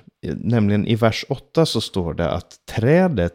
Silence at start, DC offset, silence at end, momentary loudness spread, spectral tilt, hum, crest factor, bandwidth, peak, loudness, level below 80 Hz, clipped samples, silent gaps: 0.25 s; under 0.1%; 0.05 s; 11 LU; -6.5 dB/octave; none; 16 dB; 16 kHz; -4 dBFS; -20 LUFS; -42 dBFS; under 0.1%; none